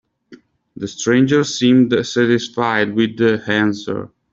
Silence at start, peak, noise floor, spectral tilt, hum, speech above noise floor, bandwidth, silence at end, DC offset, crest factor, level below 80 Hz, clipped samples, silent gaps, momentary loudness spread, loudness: 0.3 s; -2 dBFS; -46 dBFS; -5 dB/octave; none; 30 dB; 7.8 kHz; 0.25 s; under 0.1%; 14 dB; -56 dBFS; under 0.1%; none; 12 LU; -16 LUFS